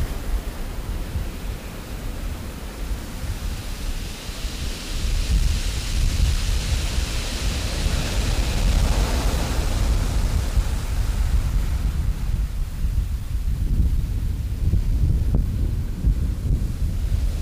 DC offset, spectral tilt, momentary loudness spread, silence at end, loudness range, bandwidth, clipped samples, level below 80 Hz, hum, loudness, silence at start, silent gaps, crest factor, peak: under 0.1%; -5 dB/octave; 9 LU; 0 s; 8 LU; 15.5 kHz; under 0.1%; -22 dBFS; none; -26 LUFS; 0 s; none; 16 dB; -6 dBFS